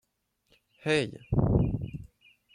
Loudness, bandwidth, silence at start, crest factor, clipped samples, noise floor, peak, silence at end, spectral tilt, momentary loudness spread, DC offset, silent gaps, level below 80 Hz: -29 LUFS; 11 kHz; 0.85 s; 20 dB; under 0.1%; -76 dBFS; -10 dBFS; 0.5 s; -7 dB/octave; 13 LU; under 0.1%; none; -42 dBFS